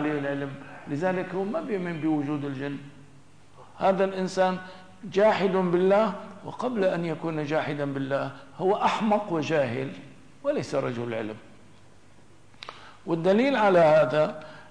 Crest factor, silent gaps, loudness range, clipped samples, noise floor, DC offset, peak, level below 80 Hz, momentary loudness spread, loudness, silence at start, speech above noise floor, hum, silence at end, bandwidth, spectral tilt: 16 dB; none; 6 LU; under 0.1%; -56 dBFS; 0.3%; -10 dBFS; -66 dBFS; 18 LU; -26 LUFS; 0 s; 30 dB; none; 0.05 s; 10.5 kHz; -6.5 dB/octave